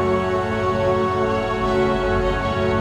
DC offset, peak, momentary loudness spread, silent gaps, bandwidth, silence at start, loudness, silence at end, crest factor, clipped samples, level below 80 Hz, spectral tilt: under 0.1%; -8 dBFS; 2 LU; none; 11 kHz; 0 s; -20 LUFS; 0 s; 12 dB; under 0.1%; -34 dBFS; -7 dB/octave